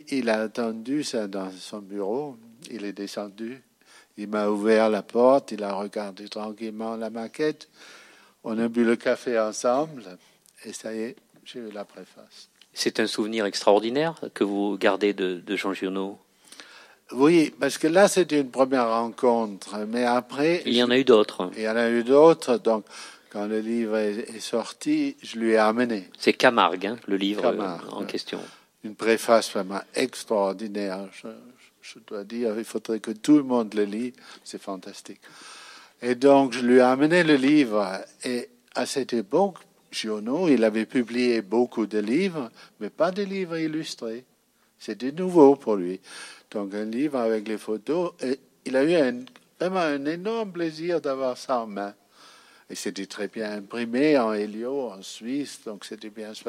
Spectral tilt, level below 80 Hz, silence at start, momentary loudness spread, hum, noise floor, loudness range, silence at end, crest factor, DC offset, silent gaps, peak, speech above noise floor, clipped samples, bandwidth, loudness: -4.5 dB/octave; -82 dBFS; 0.1 s; 19 LU; none; -65 dBFS; 9 LU; 0 s; 22 dB; under 0.1%; none; -2 dBFS; 41 dB; under 0.1%; 15 kHz; -24 LUFS